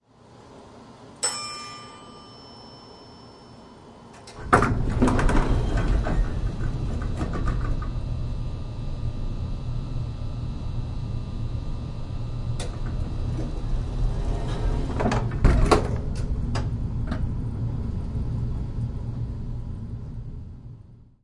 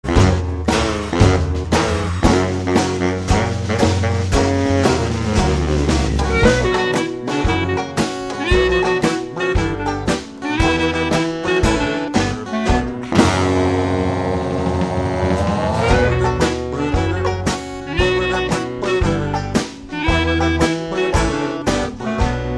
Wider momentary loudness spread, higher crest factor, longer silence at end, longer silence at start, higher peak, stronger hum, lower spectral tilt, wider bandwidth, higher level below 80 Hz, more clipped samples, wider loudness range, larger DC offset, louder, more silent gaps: first, 22 LU vs 6 LU; first, 24 dB vs 18 dB; first, 0.2 s vs 0 s; first, 0.3 s vs 0.05 s; about the same, -2 dBFS vs 0 dBFS; neither; about the same, -6 dB/octave vs -5.5 dB/octave; about the same, 11.5 kHz vs 11 kHz; about the same, -30 dBFS vs -26 dBFS; neither; first, 8 LU vs 2 LU; second, under 0.1% vs 0.2%; second, -28 LUFS vs -18 LUFS; neither